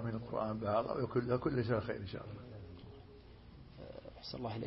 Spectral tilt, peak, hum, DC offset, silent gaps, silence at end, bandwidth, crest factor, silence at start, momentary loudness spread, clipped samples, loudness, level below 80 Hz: -6.5 dB/octave; -22 dBFS; none; under 0.1%; none; 0 s; 5.6 kHz; 18 dB; 0 s; 21 LU; under 0.1%; -38 LUFS; -60 dBFS